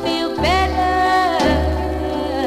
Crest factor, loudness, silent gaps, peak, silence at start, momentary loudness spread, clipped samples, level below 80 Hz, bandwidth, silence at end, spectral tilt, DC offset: 12 dB; -17 LUFS; none; -6 dBFS; 0 s; 6 LU; under 0.1%; -26 dBFS; 15.5 kHz; 0 s; -5.5 dB/octave; 0.2%